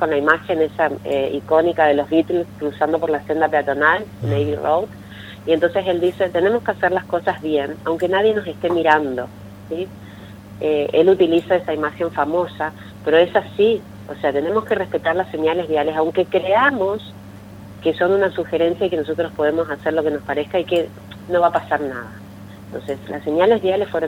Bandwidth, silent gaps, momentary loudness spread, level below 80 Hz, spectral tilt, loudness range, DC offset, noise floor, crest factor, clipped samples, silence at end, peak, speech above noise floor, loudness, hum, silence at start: 16.5 kHz; none; 15 LU; -54 dBFS; -6.5 dB/octave; 3 LU; under 0.1%; -37 dBFS; 18 dB; under 0.1%; 0 s; 0 dBFS; 19 dB; -19 LUFS; 50 Hz at -40 dBFS; 0 s